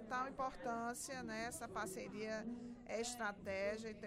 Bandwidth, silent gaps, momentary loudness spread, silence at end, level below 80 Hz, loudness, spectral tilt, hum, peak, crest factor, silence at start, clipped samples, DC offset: 16 kHz; none; 4 LU; 0 s; -68 dBFS; -45 LUFS; -3.5 dB/octave; none; -30 dBFS; 14 dB; 0 s; under 0.1%; under 0.1%